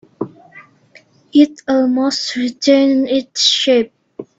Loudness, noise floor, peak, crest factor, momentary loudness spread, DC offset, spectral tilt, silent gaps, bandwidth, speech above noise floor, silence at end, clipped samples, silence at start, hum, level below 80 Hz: -14 LUFS; -48 dBFS; 0 dBFS; 16 dB; 16 LU; under 0.1%; -2.5 dB/octave; none; 7.8 kHz; 35 dB; 0.15 s; under 0.1%; 0.2 s; none; -62 dBFS